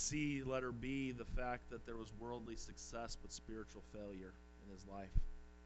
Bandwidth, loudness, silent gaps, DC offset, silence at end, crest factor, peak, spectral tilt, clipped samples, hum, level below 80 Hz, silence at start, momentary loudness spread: 8.2 kHz; -47 LUFS; none; under 0.1%; 0 s; 22 dB; -22 dBFS; -4.5 dB/octave; under 0.1%; none; -50 dBFS; 0 s; 13 LU